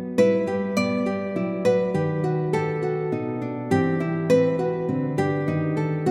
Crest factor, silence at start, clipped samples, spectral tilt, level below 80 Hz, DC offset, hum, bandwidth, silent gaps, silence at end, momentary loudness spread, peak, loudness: 16 dB; 0 s; under 0.1%; -7.5 dB/octave; -62 dBFS; under 0.1%; none; 13 kHz; none; 0 s; 6 LU; -6 dBFS; -24 LUFS